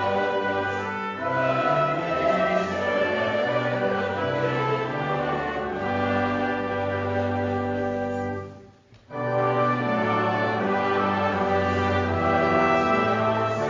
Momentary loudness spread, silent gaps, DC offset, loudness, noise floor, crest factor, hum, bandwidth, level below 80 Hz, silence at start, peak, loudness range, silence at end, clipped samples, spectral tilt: 6 LU; none; under 0.1%; -24 LUFS; -51 dBFS; 16 dB; none; 7.6 kHz; -48 dBFS; 0 s; -8 dBFS; 4 LU; 0 s; under 0.1%; -7 dB/octave